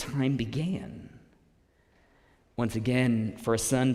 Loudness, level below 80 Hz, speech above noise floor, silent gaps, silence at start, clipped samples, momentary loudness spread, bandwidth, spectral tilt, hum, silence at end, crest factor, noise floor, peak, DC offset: -29 LUFS; -54 dBFS; 37 dB; none; 0 s; under 0.1%; 15 LU; 16 kHz; -5.5 dB/octave; none; 0 s; 18 dB; -65 dBFS; -12 dBFS; under 0.1%